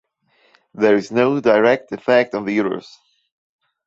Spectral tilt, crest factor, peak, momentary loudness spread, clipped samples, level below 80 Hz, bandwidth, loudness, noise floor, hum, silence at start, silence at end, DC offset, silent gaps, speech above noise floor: -6.5 dB/octave; 18 dB; -2 dBFS; 6 LU; under 0.1%; -62 dBFS; 7.8 kHz; -17 LUFS; -60 dBFS; none; 0.75 s; 1.05 s; under 0.1%; none; 43 dB